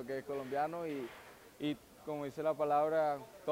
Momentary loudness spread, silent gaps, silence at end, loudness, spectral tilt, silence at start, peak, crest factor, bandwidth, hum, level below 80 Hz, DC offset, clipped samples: 13 LU; none; 0 s; -37 LUFS; -6 dB/octave; 0 s; -22 dBFS; 16 dB; 16 kHz; none; -74 dBFS; under 0.1%; under 0.1%